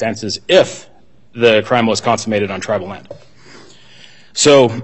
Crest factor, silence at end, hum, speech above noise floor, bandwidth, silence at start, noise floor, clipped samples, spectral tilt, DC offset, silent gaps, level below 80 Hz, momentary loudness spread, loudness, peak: 16 dB; 0 s; none; 30 dB; 8.4 kHz; 0 s; -44 dBFS; under 0.1%; -4 dB/octave; 0.7%; none; -54 dBFS; 19 LU; -14 LUFS; 0 dBFS